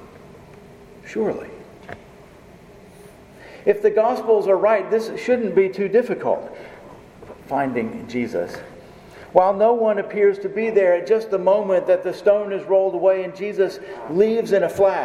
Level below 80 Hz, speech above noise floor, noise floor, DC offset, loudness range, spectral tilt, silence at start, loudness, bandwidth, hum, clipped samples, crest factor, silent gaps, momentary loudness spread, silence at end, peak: -58 dBFS; 26 dB; -45 dBFS; under 0.1%; 8 LU; -6.5 dB/octave; 0 s; -20 LUFS; 13.5 kHz; none; under 0.1%; 20 dB; none; 15 LU; 0 s; 0 dBFS